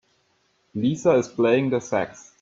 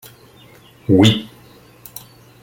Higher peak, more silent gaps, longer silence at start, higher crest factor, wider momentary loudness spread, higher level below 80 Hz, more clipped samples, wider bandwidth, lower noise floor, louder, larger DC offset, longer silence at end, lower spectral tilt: second, -6 dBFS vs 0 dBFS; neither; second, 0.75 s vs 0.9 s; about the same, 18 dB vs 20 dB; second, 10 LU vs 24 LU; second, -64 dBFS vs -52 dBFS; neither; second, 7.8 kHz vs 17 kHz; first, -67 dBFS vs -46 dBFS; second, -22 LUFS vs -14 LUFS; neither; second, 0.2 s vs 1.15 s; about the same, -6 dB/octave vs -6 dB/octave